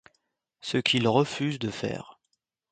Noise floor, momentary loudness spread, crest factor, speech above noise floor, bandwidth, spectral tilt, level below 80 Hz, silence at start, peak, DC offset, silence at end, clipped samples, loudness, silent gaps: -78 dBFS; 13 LU; 22 dB; 52 dB; 9.4 kHz; -5 dB/octave; -64 dBFS; 0.65 s; -8 dBFS; under 0.1%; 0.6 s; under 0.1%; -27 LUFS; none